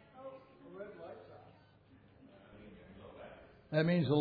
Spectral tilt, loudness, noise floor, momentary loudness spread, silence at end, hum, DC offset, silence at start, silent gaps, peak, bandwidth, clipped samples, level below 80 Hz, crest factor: -6.5 dB/octave; -36 LUFS; -63 dBFS; 27 LU; 0 s; none; under 0.1%; 0.15 s; none; -20 dBFS; 4.9 kHz; under 0.1%; -72 dBFS; 20 dB